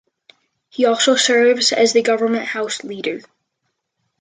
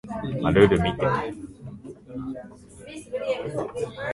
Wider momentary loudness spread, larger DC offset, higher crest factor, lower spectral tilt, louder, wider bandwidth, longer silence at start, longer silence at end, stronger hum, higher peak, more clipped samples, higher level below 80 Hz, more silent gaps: second, 12 LU vs 23 LU; neither; second, 16 dB vs 22 dB; second, -1.5 dB/octave vs -7 dB/octave; first, -16 LUFS vs -24 LUFS; second, 9.6 kHz vs 11.5 kHz; first, 0.8 s vs 0.05 s; first, 1 s vs 0 s; neither; about the same, -2 dBFS vs -2 dBFS; neither; second, -72 dBFS vs -44 dBFS; neither